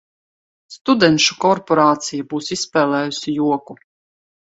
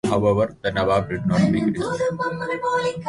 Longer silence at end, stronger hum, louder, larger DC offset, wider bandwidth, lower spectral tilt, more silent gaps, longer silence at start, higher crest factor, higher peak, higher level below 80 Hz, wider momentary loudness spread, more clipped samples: first, 0.8 s vs 0 s; neither; first, -17 LUFS vs -22 LUFS; neither; second, 8 kHz vs 11.5 kHz; second, -4 dB/octave vs -6.5 dB/octave; first, 0.81-0.85 s vs none; first, 0.7 s vs 0.05 s; about the same, 18 dB vs 14 dB; first, 0 dBFS vs -6 dBFS; second, -60 dBFS vs -46 dBFS; first, 10 LU vs 5 LU; neither